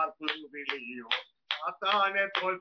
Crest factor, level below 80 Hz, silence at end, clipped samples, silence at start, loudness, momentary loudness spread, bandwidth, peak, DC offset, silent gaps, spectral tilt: 20 dB; -86 dBFS; 0 s; under 0.1%; 0 s; -31 LUFS; 10 LU; 5.4 kHz; -12 dBFS; under 0.1%; none; -3.5 dB/octave